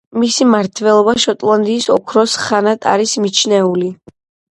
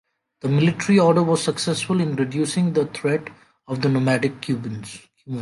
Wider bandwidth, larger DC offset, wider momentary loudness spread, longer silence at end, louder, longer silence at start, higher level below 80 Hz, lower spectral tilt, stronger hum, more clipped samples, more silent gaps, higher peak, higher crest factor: about the same, 11.5 kHz vs 11.5 kHz; neither; second, 3 LU vs 15 LU; first, 0.55 s vs 0 s; first, -13 LUFS vs -21 LUFS; second, 0.15 s vs 0.45 s; first, -56 dBFS vs -62 dBFS; second, -3.5 dB/octave vs -6 dB/octave; neither; neither; neither; first, 0 dBFS vs -4 dBFS; about the same, 14 dB vs 16 dB